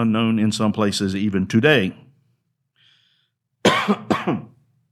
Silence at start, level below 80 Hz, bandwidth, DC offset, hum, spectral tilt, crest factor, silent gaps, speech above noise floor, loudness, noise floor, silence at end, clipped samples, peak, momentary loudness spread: 0 s; -62 dBFS; 14 kHz; under 0.1%; none; -5.5 dB/octave; 20 dB; none; 50 dB; -20 LUFS; -69 dBFS; 0.45 s; under 0.1%; -2 dBFS; 7 LU